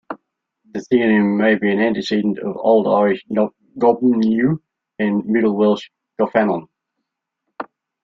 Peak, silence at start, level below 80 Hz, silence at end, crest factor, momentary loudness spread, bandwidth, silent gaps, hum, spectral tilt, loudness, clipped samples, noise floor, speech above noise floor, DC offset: -2 dBFS; 0.1 s; -60 dBFS; 0.4 s; 16 dB; 18 LU; 7.2 kHz; none; none; -7.5 dB/octave; -18 LUFS; under 0.1%; -78 dBFS; 61 dB; under 0.1%